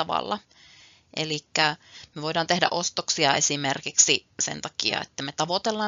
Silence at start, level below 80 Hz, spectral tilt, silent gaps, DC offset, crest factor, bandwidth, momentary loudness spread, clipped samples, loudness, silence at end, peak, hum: 0 s; -68 dBFS; -1.5 dB/octave; none; under 0.1%; 24 dB; 7.8 kHz; 13 LU; under 0.1%; -24 LUFS; 0 s; -2 dBFS; none